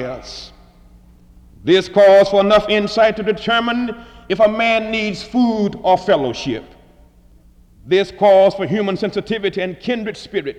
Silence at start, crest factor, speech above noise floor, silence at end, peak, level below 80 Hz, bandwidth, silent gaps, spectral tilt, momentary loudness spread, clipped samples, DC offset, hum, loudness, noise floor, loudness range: 0 s; 14 dB; 32 dB; 0.05 s; -2 dBFS; -46 dBFS; 9.4 kHz; none; -5.5 dB/octave; 14 LU; under 0.1%; under 0.1%; none; -16 LUFS; -48 dBFS; 4 LU